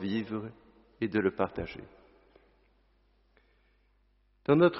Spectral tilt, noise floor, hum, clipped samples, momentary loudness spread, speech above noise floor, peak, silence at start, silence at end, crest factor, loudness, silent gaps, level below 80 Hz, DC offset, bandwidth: -6 dB/octave; -69 dBFS; 50 Hz at -65 dBFS; under 0.1%; 15 LU; 40 dB; -10 dBFS; 0 s; 0 s; 22 dB; -32 LUFS; none; -62 dBFS; under 0.1%; 5.8 kHz